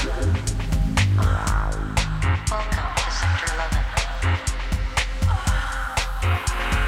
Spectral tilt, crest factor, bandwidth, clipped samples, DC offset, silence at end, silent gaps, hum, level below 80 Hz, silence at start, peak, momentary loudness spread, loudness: -4.5 dB/octave; 16 dB; 15 kHz; under 0.1%; under 0.1%; 0 s; none; none; -26 dBFS; 0 s; -6 dBFS; 4 LU; -23 LUFS